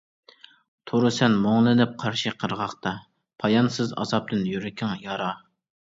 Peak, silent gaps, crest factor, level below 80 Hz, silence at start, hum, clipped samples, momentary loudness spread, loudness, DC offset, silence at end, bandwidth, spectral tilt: -6 dBFS; none; 20 dB; -62 dBFS; 0.85 s; none; under 0.1%; 11 LU; -24 LUFS; under 0.1%; 0.5 s; 7.8 kHz; -6 dB/octave